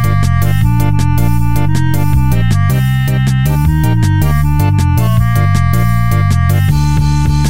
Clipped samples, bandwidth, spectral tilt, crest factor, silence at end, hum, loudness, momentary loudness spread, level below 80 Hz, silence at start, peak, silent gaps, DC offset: under 0.1%; 16.5 kHz; -6.5 dB/octave; 10 dB; 0 s; none; -12 LUFS; 1 LU; -20 dBFS; 0 s; 0 dBFS; none; under 0.1%